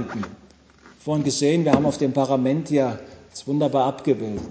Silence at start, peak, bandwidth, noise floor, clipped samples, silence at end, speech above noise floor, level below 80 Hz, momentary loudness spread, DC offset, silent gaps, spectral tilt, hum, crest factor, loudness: 0 s; -4 dBFS; 8 kHz; -51 dBFS; under 0.1%; 0 s; 30 dB; -52 dBFS; 16 LU; under 0.1%; none; -6 dB/octave; none; 18 dB; -22 LUFS